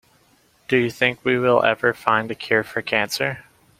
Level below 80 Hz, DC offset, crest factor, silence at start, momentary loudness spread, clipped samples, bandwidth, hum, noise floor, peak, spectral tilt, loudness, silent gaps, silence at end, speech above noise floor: -60 dBFS; under 0.1%; 22 dB; 0.7 s; 6 LU; under 0.1%; 16.5 kHz; none; -59 dBFS; 0 dBFS; -4.5 dB/octave; -20 LUFS; none; 0.4 s; 38 dB